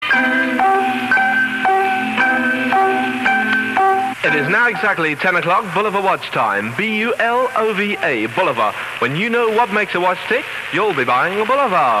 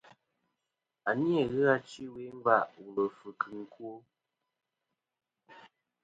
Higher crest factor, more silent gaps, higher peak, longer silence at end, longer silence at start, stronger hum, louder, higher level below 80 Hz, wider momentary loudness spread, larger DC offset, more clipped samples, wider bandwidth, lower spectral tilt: second, 12 dB vs 24 dB; neither; first, -4 dBFS vs -10 dBFS; second, 0 s vs 0.45 s; second, 0 s vs 1.05 s; neither; first, -16 LUFS vs -31 LUFS; first, -58 dBFS vs -74 dBFS; second, 4 LU vs 17 LU; neither; neither; first, 14.5 kHz vs 9 kHz; second, -5 dB/octave vs -7 dB/octave